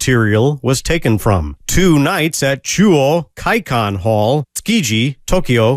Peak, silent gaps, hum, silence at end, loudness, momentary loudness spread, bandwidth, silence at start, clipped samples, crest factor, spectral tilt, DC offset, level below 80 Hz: 0 dBFS; none; none; 0 s; -14 LUFS; 5 LU; 16 kHz; 0 s; under 0.1%; 14 dB; -5 dB/octave; under 0.1%; -30 dBFS